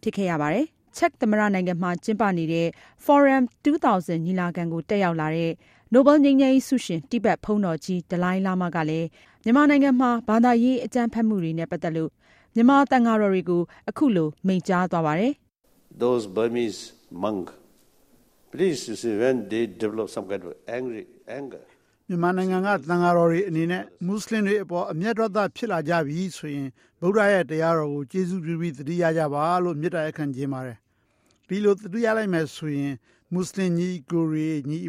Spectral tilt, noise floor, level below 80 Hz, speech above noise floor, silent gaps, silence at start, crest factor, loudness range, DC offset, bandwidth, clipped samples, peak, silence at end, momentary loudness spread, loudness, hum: -7 dB/octave; -66 dBFS; -62 dBFS; 43 dB; none; 0.05 s; 18 dB; 7 LU; under 0.1%; 15 kHz; under 0.1%; -6 dBFS; 0 s; 13 LU; -23 LUFS; none